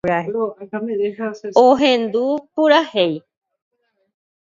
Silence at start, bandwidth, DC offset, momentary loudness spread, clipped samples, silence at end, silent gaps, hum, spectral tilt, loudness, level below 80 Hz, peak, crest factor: 0.05 s; 7.6 kHz; under 0.1%; 12 LU; under 0.1%; 1.2 s; none; none; -5.5 dB/octave; -17 LUFS; -60 dBFS; 0 dBFS; 18 dB